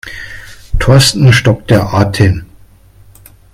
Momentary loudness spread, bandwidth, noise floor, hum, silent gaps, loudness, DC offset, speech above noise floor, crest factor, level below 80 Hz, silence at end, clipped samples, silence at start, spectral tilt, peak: 19 LU; 15.5 kHz; -41 dBFS; none; none; -10 LUFS; under 0.1%; 33 dB; 12 dB; -26 dBFS; 1.1 s; 0.2%; 0.05 s; -5 dB/octave; 0 dBFS